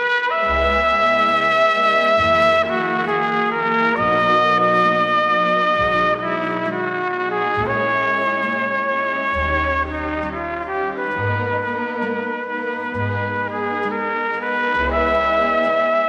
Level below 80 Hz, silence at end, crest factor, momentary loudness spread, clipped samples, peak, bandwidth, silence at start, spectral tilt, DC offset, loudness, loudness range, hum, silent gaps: -38 dBFS; 0 s; 14 dB; 8 LU; under 0.1%; -6 dBFS; 9.6 kHz; 0 s; -6 dB/octave; under 0.1%; -18 LUFS; 6 LU; none; none